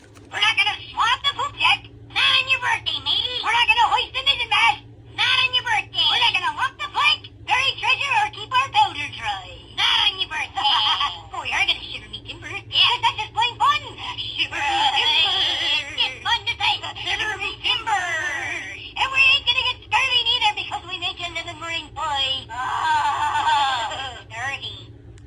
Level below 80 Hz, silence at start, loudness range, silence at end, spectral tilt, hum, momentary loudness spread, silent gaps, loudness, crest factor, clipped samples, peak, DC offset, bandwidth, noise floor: -50 dBFS; 0.15 s; 4 LU; 0.05 s; -1 dB/octave; none; 12 LU; none; -20 LUFS; 18 dB; under 0.1%; -4 dBFS; under 0.1%; 15.5 kHz; -41 dBFS